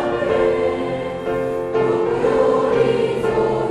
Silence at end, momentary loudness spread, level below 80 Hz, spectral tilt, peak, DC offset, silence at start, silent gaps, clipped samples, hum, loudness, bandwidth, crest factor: 0 s; 7 LU; -44 dBFS; -7 dB/octave; -6 dBFS; under 0.1%; 0 s; none; under 0.1%; none; -19 LUFS; 11 kHz; 12 dB